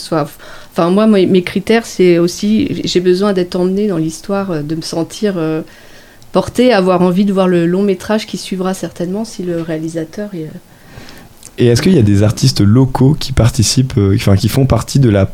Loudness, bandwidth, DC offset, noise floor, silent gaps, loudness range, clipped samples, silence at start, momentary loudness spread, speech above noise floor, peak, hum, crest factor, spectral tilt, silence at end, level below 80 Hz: -13 LUFS; 16.5 kHz; under 0.1%; -35 dBFS; none; 7 LU; under 0.1%; 0 s; 10 LU; 23 dB; 0 dBFS; none; 12 dB; -6 dB/octave; 0 s; -34 dBFS